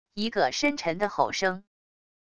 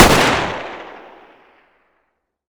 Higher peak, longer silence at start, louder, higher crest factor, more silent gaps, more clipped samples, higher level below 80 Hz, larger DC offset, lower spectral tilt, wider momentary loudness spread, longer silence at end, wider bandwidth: second, -8 dBFS vs 0 dBFS; about the same, 0.05 s vs 0 s; second, -27 LUFS vs -15 LUFS; about the same, 20 dB vs 18 dB; neither; second, under 0.1% vs 0.2%; second, -62 dBFS vs -32 dBFS; first, 0.4% vs under 0.1%; about the same, -3.5 dB/octave vs -3.5 dB/octave; second, 5 LU vs 25 LU; second, 0.7 s vs 1.55 s; second, 11 kHz vs over 20 kHz